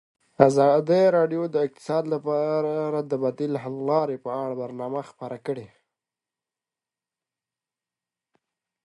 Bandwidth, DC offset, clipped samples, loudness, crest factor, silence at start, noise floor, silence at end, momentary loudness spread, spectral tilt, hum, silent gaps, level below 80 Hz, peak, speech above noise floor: 11.5 kHz; under 0.1%; under 0.1%; -24 LUFS; 24 dB; 0.4 s; under -90 dBFS; 3.2 s; 13 LU; -7 dB/octave; none; none; -72 dBFS; 0 dBFS; over 67 dB